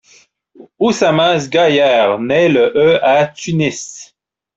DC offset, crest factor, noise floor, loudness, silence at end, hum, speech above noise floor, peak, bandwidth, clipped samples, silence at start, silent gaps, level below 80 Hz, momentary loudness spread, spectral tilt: under 0.1%; 12 dB; -58 dBFS; -13 LUFS; 0.5 s; none; 46 dB; -2 dBFS; 8 kHz; under 0.1%; 0.6 s; none; -54 dBFS; 7 LU; -5 dB/octave